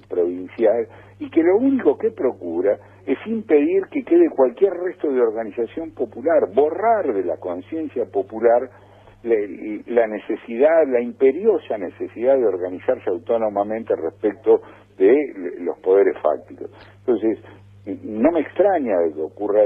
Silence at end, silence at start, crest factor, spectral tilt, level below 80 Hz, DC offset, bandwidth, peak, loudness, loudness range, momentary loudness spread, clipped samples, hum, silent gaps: 0 s; 0.1 s; 16 dB; -9 dB/octave; -62 dBFS; under 0.1%; 3.7 kHz; -4 dBFS; -20 LUFS; 2 LU; 11 LU; under 0.1%; none; none